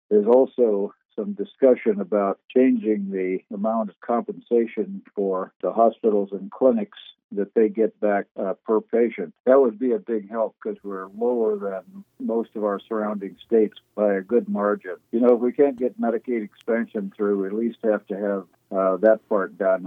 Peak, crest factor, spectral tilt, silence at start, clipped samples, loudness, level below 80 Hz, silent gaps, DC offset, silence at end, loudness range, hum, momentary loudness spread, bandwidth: -4 dBFS; 18 dB; -10 dB/octave; 0.1 s; under 0.1%; -23 LUFS; -80 dBFS; 1.05-1.09 s, 2.44-2.49 s, 3.97-4.01 s, 5.56-5.60 s, 7.24-7.29 s, 8.31-8.35 s, 9.40-9.44 s; under 0.1%; 0 s; 3 LU; none; 11 LU; 3.9 kHz